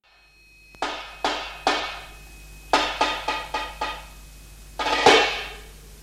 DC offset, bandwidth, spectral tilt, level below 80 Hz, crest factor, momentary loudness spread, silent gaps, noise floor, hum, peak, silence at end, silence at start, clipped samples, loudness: under 0.1%; 16 kHz; -2 dB/octave; -46 dBFS; 24 dB; 25 LU; none; -55 dBFS; none; -2 dBFS; 0 s; 0.8 s; under 0.1%; -23 LUFS